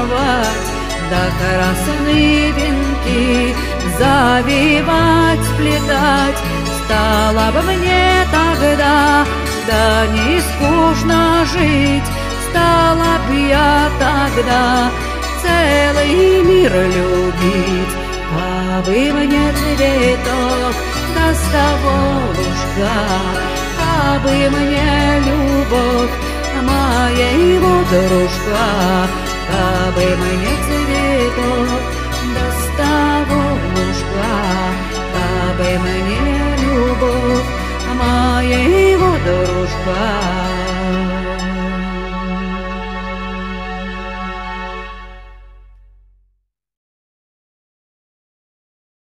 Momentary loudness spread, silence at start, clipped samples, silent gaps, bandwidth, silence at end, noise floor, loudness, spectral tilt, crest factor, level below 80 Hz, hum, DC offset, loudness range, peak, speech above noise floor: 9 LU; 0 s; under 0.1%; none; 15.5 kHz; 3.55 s; -65 dBFS; -14 LUFS; -5 dB/octave; 14 dB; -24 dBFS; none; under 0.1%; 7 LU; 0 dBFS; 52 dB